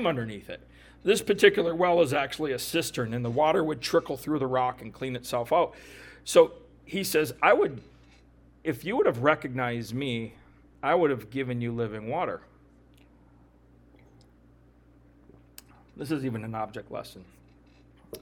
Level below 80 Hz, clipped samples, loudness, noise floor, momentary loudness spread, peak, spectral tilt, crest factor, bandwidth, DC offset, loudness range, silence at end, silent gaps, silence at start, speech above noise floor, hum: -58 dBFS; under 0.1%; -27 LUFS; -58 dBFS; 18 LU; -6 dBFS; -5 dB/octave; 22 dB; 19 kHz; under 0.1%; 13 LU; 0.05 s; none; 0 s; 31 dB; none